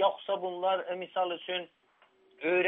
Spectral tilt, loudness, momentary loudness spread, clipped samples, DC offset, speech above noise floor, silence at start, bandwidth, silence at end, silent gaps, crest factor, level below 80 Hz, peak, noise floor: -1 dB/octave; -33 LUFS; 6 LU; under 0.1%; under 0.1%; 34 dB; 0 s; 3.9 kHz; 0 s; none; 18 dB; under -90 dBFS; -14 dBFS; -65 dBFS